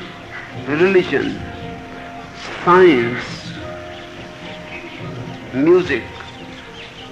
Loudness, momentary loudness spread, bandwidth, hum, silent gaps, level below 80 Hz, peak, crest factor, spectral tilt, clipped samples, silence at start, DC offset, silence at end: -16 LUFS; 20 LU; 8.2 kHz; none; none; -46 dBFS; -2 dBFS; 18 dB; -6.5 dB/octave; under 0.1%; 0 s; under 0.1%; 0 s